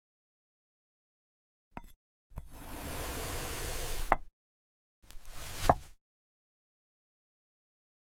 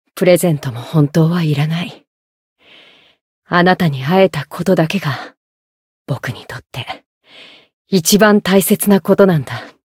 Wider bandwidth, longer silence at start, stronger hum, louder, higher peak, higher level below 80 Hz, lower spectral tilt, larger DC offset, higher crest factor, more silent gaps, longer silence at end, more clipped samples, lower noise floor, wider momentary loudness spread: about the same, 17 kHz vs 16.5 kHz; first, 1.75 s vs 0.15 s; neither; second, -35 LUFS vs -14 LUFS; second, -6 dBFS vs 0 dBFS; first, -46 dBFS vs -54 dBFS; second, -4 dB/octave vs -5.5 dB/octave; neither; first, 34 dB vs 16 dB; second, 1.96-2.30 s, 4.33-5.02 s vs 2.07-2.56 s, 3.21-3.42 s, 5.37-6.05 s, 7.06-7.21 s, 7.73-7.85 s; first, 2.1 s vs 0.25 s; neither; first, under -90 dBFS vs -46 dBFS; first, 22 LU vs 17 LU